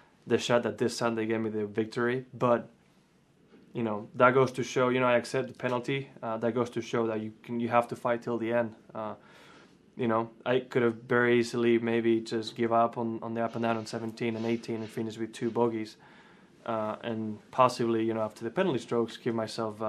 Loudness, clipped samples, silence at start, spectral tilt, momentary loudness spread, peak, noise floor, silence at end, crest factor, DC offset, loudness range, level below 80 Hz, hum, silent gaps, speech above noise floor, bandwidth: -30 LUFS; under 0.1%; 0.25 s; -6 dB/octave; 10 LU; -6 dBFS; -64 dBFS; 0 s; 24 dB; under 0.1%; 5 LU; -76 dBFS; none; none; 35 dB; 13 kHz